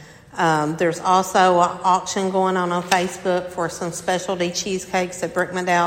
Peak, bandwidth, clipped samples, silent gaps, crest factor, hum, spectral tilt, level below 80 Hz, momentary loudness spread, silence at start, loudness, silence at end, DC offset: 0 dBFS; 16.5 kHz; under 0.1%; none; 20 dB; none; -4 dB/octave; -56 dBFS; 8 LU; 0 s; -20 LUFS; 0 s; under 0.1%